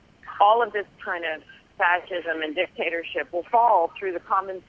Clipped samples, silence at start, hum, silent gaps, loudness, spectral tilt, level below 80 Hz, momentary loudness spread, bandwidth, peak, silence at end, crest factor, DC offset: under 0.1%; 0.25 s; none; none; -24 LUFS; -5 dB/octave; -64 dBFS; 12 LU; 6.4 kHz; -4 dBFS; 0.1 s; 20 dB; under 0.1%